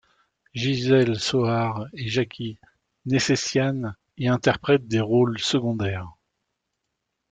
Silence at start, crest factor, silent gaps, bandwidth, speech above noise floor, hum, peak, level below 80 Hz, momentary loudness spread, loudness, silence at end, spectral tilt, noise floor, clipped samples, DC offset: 0.55 s; 18 dB; none; 9.4 kHz; 57 dB; none; -6 dBFS; -58 dBFS; 14 LU; -23 LUFS; 1.2 s; -5.5 dB/octave; -80 dBFS; under 0.1%; under 0.1%